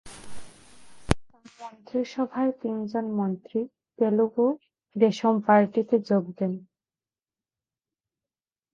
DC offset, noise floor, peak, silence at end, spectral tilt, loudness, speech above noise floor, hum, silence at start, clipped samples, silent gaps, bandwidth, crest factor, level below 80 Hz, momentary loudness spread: under 0.1%; under -90 dBFS; -2 dBFS; 2.1 s; -7 dB/octave; -26 LUFS; over 65 dB; none; 0.05 s; under 0.1%; none; 11.5 kHz; 26 dB; -50 dBFS; 18 LU